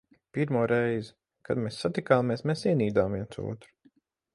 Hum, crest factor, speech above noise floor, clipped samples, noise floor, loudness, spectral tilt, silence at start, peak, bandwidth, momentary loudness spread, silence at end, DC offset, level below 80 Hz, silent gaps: none; 20 dB; 38 dB; under 0.1%; -65 dBFS; -28 LUFS; -7 dB/octave; 0.35 s; -8 dBFS; 11.5 kHz; 13 LU; 0.7 s; under 0.1%; -58 dBFS; none